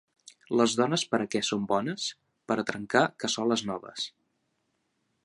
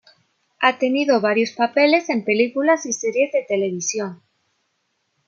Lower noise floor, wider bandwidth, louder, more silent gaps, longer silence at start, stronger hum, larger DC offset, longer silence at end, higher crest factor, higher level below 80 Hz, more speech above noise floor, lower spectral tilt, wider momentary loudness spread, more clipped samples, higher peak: first, -77 dBFS vs -71 dBFS; first, 11.5 kHz vs 7.8 kHz; second, -29 LUFS vs -19 LUFS; neither; about the same, 0.5 s vs 0.6 s; neither; neither; about the same, 1.15 s vs 1.15 s; first, 24 dB vs 18 dB; about the same, -70 dBFS vs -74 dBFS; about the same, 49 dB vs 52 dB; about the same, -3.5 dB/octave vs -3.5 dB/octave; first, 10 LU vs 7 LU; neither; second, -6 dBFS vs -2 dBFS